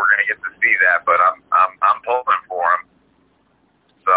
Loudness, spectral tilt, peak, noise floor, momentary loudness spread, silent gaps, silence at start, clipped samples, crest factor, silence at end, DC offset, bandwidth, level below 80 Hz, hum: -16 LUFS; -4.5 dB/octave; -2 dBFS; -60 dBFS; 6 LU; none; 0 s; under 0.1%; 16 dB; 0 s; under 0.1%; 4 kHz; -66 dBFS; none